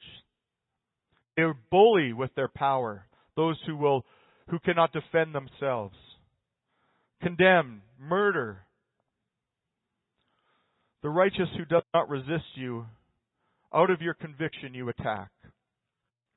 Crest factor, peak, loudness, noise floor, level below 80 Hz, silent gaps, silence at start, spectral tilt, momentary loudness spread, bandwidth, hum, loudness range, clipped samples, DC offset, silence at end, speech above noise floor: 22 dB; -8 dBFS; -27 LUFS; -86 dBFS; -64 dBFS; none; 0.05 s; -10 dB/octave; 16 LU; 4.1 kHz; none; 5 LU; under 0.1%; under 0.1%; 1.1 s; 59 dB